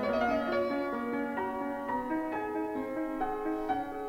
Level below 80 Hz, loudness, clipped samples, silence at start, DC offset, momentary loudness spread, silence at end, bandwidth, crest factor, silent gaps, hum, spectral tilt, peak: -56 dBFS; -33 LUFS; under 0.1%; 0 s; under 0.1%; 5 LU; 0 s; 16 kHz; 16 dB; none; none; -6.5 dB/octave; -16 dBFS